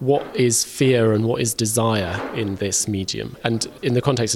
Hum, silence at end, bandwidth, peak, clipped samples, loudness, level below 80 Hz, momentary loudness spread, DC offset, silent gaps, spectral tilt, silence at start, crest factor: none; 0 s; 16.5 kHz; -2 dBFS; under 0.1%; -20 LUFS; -52 dBFS; 8 LU; under 0.1%; none; -4.5 dB/octave; 0 s; 18 dB